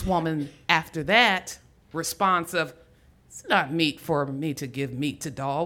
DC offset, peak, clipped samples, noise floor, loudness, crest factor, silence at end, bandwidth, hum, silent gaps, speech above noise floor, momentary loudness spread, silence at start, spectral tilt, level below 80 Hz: under 0.1%; -2 dBFS; under 0.1%; -56 dBFS; -25 LUFS; 24 dB; 0 s; 18 kHz; none; none; 31 dB; 13 LU; 0 s; -4 dB/octave; -50 dBFS